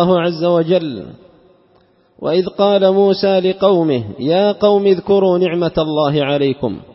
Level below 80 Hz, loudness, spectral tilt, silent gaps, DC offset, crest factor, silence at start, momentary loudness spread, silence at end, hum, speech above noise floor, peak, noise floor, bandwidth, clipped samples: -50 dBFS; -14 LUFS; -10.5 dB/octave; none; under 0.1%; 14 dB; 0 s; 6 LU; 0.15 s; none; 39 dB; 0 dBFS; -53 dBFS; 5.8 kHz; under 0.1%